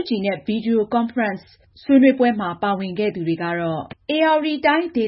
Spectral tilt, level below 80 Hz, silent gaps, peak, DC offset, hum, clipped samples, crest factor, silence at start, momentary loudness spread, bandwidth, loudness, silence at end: -11 dB/octave; -58 dBFS; none; -2 dBFS; under 0.1%; none; under 0.1%; 16 dB; 0 s; 10 LU; 5.8 kHz; -20 LUFS; 0 s